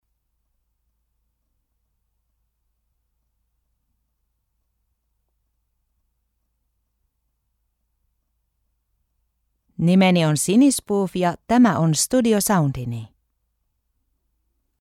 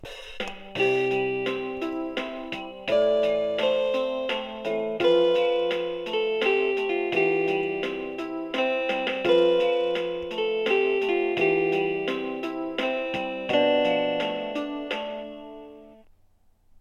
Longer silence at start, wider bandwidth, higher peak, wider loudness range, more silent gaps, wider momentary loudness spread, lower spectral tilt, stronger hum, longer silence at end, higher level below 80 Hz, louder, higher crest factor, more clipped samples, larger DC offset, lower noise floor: first, 9.8 s vs 0 s; first, 16 kHz vs 9.6 kHz; first, -4 dBFS vs -8 dBFS; about the same, 5 LU vs 3 LU; neither; second, 8 LU vs 11 LU; about the same, -5 dB/octave vs -5 dB/octave; neither; first, 1.75 s vs 0.85 s; about the same, -56 dBFS vs -60 dBFS; first, -18 LUFS vs -25 LUFS; about the same, 20 dB vs 16 dB; neither; neither; first, -73 dBFS vs -60 dBFS